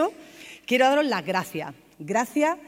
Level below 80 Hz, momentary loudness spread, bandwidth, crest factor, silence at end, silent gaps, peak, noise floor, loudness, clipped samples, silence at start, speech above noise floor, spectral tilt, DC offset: -72 dBFS; 21 LU; 16 kHz; 18 dB; 0.05 s; none; -8 dBFS; -45 dBFS; -24 LUFS; under 0.1%; 0 s; 22 dB; -4 dB/octave; under 0.1%